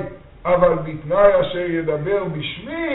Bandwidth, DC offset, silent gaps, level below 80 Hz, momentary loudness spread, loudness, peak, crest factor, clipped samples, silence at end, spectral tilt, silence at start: 4.1 kHz; under 0.1%; none; -42 dBFS; 12 LU; -19 LUFS; 0 dBFS; 18 dB; under 0.1%; 0 s; -4.5 dB/octave; 0 s